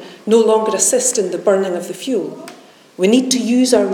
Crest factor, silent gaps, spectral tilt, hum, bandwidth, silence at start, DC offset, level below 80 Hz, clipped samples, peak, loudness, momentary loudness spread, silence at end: 16 dB; none; -3.5 dB/octave; none; 18 kHz; 0 s; under 0.1%; -66 dBFS; under 0.1%; 0 dBFS; -15 LUFS; 9 LU; 0 s